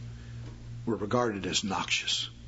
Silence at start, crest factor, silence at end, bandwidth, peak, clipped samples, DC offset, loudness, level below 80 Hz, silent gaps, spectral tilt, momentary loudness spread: 0 s; 20 dB; 0 s; 8 kHz; -12 dBFS; under 0.1%; under 0.1%; -30 LUFS; -52 dBFS; none; -3.5 dB/octave; 16 LU